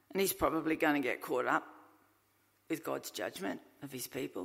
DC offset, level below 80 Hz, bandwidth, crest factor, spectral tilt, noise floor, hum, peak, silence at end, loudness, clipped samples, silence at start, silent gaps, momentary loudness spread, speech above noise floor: under 0.1%; -66 dBFS; 16 kHz; 20 dB; -4 dB/octave; -73 dBFS; none; -16 dBFS; 0 s; -35 LUFS; under 0.1%; 0.1 s; none; 12 LU; 37 dB